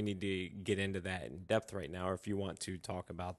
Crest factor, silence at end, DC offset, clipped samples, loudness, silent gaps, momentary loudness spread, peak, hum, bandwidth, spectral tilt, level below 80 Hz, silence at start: 20 dB; 0.05 s; under 0.1%; under 0.1%; -39 LUFS; none; 7 LU; -18 dBFS; none; 12.5 kHz; -5.5 dB/octave; -58 dBFS; 0 s